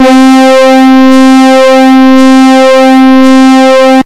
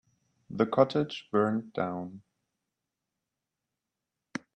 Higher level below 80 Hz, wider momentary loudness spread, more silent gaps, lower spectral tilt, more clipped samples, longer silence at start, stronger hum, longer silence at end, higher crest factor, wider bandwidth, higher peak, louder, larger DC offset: first, -46 dBFS vs -74 dBFS; second, 1 LU vs 17 LU; neither; second, -3.5 dB/octave vs -7 dB/octave; first, 40% vs under 0.1%; second, 0 s vs 0.5 s; neither; second, 0 s vs 0.2 s; second, 2 dB vs 24 dB; first, 13 kHz vs 9.6 kHz; first, 0 dBFS vs -8 dBFS; first, -2 LUFS vs -29 LUFS; first, 8% vs under 0.1%